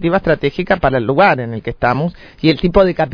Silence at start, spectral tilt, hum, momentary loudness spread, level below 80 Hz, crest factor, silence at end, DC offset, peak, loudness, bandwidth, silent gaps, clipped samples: 0 s; -8.5 dB/octave; none; 7 LU; -32 dBFS; 14 dB; 0 s; under 0.1%; 0 dBFS; -15 LUFS; 5.4 kHz; none; under 0.1%